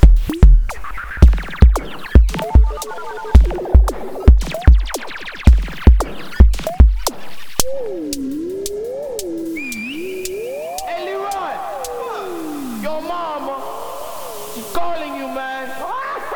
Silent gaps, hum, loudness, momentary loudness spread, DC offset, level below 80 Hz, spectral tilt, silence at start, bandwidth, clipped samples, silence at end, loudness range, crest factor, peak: none; none; -18 LUFS; 13 LU; under 0.1%; -16 dBFS; -6 dB/octave; 0 s; 19.5 kHz; 0.9%; 0 s; 10 LU; 14 dB; 0 dBFS